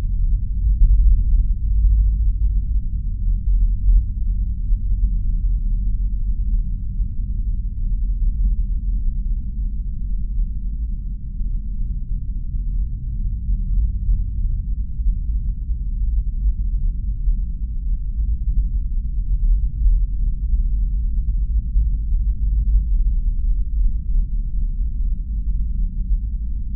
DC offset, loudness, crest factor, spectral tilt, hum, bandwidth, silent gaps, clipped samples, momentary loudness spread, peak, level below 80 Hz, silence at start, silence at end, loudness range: under 0.1%; -24 LUFS; 14 dB; -18 dB/octave; none; 0.4 kHz; none; under 0.1%; 7 LU; -4 dBFS; -18 dBFS; 0 s; 0 s; 5 LU